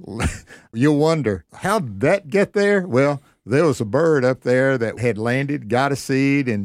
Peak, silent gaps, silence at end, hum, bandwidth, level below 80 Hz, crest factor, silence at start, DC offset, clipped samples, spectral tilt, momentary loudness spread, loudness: -4 dBFS; none; 0 s; none; 15.5 kHz; -44 dBFS; 16 dB; 0 s; under 0.1%; under 0.1%; -6.5 dB/octave; 8 LU; -19 LUFS